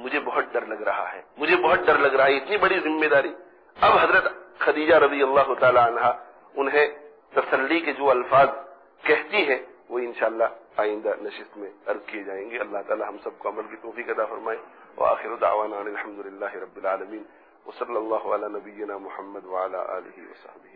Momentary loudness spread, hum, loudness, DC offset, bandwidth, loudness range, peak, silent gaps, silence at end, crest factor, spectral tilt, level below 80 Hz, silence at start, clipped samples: 16 LU; none; -23 LUFS; under 0.1%; 5.2 kHz; 11 LU; -8 dBFS; none; 0.4 s; 16 dB; -7.5 dB/octave; -62 dBFS; 0 s; under 0.1%